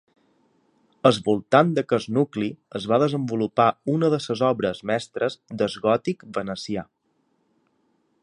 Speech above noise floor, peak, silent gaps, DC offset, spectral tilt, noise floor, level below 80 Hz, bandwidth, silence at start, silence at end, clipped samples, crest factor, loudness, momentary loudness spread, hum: 47 dB; -2 dBFS; none; under 0.1%; -6.5 dB/octave; -69 dBFS; -62 dBFS; 11 kHz; 1.05 s; 1.4 s; under 0.1%; 22 dB; -23 LUFS; 10 LU; none